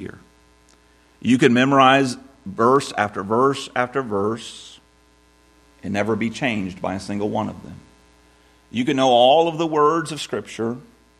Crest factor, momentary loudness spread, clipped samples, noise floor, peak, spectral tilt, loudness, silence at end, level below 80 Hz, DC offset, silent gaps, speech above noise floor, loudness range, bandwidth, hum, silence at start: 20 dB; 17 LU; under 0.1%; -56 dBFS; 0 dBFS; -5 dB/octave; -20 LUFS; 0.4 s; -58 dBFS; under 0.1%; none; 36 dB; 8 LU; 13 kHz; none; 0 s